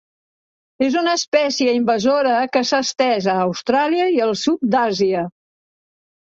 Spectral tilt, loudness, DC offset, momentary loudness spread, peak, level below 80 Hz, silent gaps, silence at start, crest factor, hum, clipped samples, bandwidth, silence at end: -4 dB/octave; -18 LUFS; under 0.1%; 3 LU; -2 dBFS; -62 dBFS; 1.28-1.32 s; 0.8 s; 16 dB; none; under 0.1%; 7.8 kHz; 0.9 s